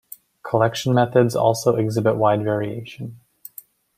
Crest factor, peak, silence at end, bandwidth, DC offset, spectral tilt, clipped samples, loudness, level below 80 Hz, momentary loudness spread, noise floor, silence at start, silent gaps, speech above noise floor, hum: 18 dB; -2 dBFS; 0.8 s; 16 kHz; under 0.1%; -6.5 dB/octave; under 0.1%; -20 LUFS; -60 dBFS; 20 LU; -46 dBFS; 0.45 s; none; 27 dB; none